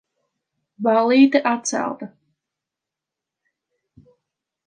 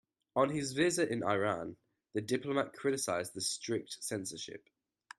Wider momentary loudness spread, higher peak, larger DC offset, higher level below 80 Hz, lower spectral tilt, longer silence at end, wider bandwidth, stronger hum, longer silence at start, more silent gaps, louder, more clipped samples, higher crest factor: first, 17 LU vs 10 LU; first, -2 dBFS vs -16 dBFS; neither; about the same, -74 dBFS vs -74 dBFS; about the same, -3.5 dB/octave vs -4 dB/octave; first, 2.6 s vs 0.6 s; second, 9.6 kHz vs 13.5 kHz; neither; first, 0.8 s vs 0.35 s; neither; first, -18 LUFS vs -35 LUFS; neither; about the same, 20 dB vs 20 dB